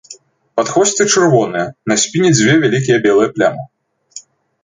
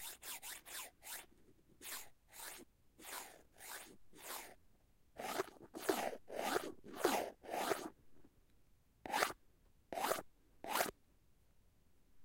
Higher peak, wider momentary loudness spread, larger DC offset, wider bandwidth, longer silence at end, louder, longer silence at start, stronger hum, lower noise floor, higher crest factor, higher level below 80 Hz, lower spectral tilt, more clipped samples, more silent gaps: first, 0 dBFS vs -18 dBFS; second, 15 LU vs 18 LU; neither; second, 9.6 kHz vs 16.5 kHz; first, 0.45 s vs 0 s; first, -13 LUFS vs -44 LUFS; about the same, 0.1 s vs 0 s; neither; second, -41 dBFS vs -72 dBFS; second, 14 dB vs 30 dB; first, -54 dBFS vs -74 dBFS; first, -4 dB/octave vs -2 dB/octave; neither; neither